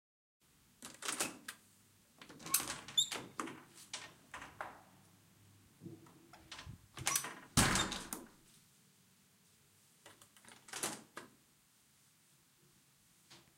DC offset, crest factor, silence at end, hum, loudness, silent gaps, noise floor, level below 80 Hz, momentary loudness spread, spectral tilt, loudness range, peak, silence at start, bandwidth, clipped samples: under 0.1%; 30 dB; 0.15 s; none; -38 LUFS; none; -71 dBFS; -62 dBFS; 26 LU; -2 dB/octave; 12 LU; -14 dBFS; 0.8 s; 16.5 kHz; under 0.1%